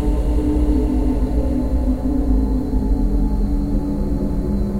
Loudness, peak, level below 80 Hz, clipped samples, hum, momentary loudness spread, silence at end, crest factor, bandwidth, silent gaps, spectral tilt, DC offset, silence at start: -20 LUFS; -6 dBFS; -20 dBFS; under 0.1%; none; 3 LU; 0 s; 12 dB; 9.4 kHz; none; -9.5 dB/octave; under 0.1%; 0 s